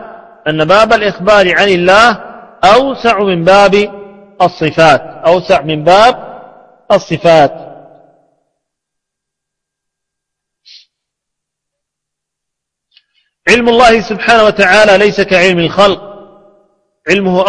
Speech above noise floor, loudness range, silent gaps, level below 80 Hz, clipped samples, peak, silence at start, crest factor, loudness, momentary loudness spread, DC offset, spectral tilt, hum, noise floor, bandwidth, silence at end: 70 dB; 7 LU; none; -40 dBFS; 0.7%; 0 dBFS; 0 s; 10 dB; -8 LUFS; 8 LU; under 0.1%; -4.5 dB/octave; none; -78 dBFS; 11 kHz; 0 s